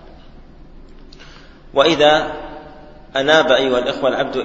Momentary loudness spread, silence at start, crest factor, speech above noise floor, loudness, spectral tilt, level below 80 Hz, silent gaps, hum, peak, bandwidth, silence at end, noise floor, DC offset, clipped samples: 17 LU; 0.05 s; 18 dB; 25 dB; -15 LUFS; -4 dB/octave; -42 dBFS; none; none; 0 dBFS; 8 kHz; 0 s; -40 dBFS; under 0.1%; under 0.1%